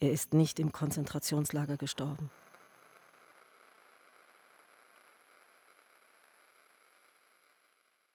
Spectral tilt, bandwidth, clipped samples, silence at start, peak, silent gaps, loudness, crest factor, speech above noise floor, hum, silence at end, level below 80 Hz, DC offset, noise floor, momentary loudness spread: -5.5 dB/octave; over 20 kHz; under 0.1%; 0 s; -16 dBFS; none; -34 LUFS; 22 dB; 41 dB; none; 5.85 s; -70 dBFS; under 0.1%; -73 dBFS; 13 LU